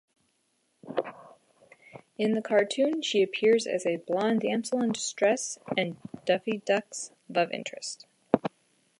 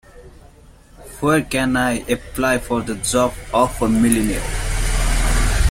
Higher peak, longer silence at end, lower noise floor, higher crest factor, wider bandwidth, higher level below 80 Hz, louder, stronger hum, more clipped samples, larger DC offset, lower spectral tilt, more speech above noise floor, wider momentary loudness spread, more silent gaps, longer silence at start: second, -4 dBFS vs 0 dBFS; first, 0.5 s vs 0 s; first, -73 dBFS vs -45 dBFS; first, 26 dB vs 18 dB; second, 11.5 kHz vs 16.5 kHz; second, -76 dBFS vs -24 dBFS; second, -28 LUFS vs -19 LUFS; neither; neither; neither; about the same, -4 dB/octave vs -4.5 dB/octave; first, 46 dB vs 27 dB; first, 13 LU vs 6 LU; neither; first, 0.85 s vs 0.15 s